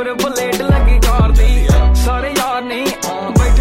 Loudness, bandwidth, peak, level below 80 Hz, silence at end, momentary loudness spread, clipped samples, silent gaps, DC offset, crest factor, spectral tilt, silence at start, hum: -14 LUFS; 16.5 kHz; 0 dBFS; -14 dBFS; 0 s; 6 LU; under 0.1%; none; under 0.1%; 10 dB; -5.5 dB/octave; 0 s; none